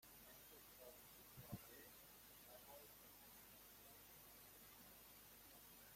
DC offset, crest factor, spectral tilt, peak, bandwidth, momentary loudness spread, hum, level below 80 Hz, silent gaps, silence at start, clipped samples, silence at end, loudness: under 0.1%; 24 dB; -3 dB/octave; -40 dBFS; 16.5 kHz; 5 LU; none; -80 dBFS; none; 0 s; under 0.1%; 0 s; -61 LUFS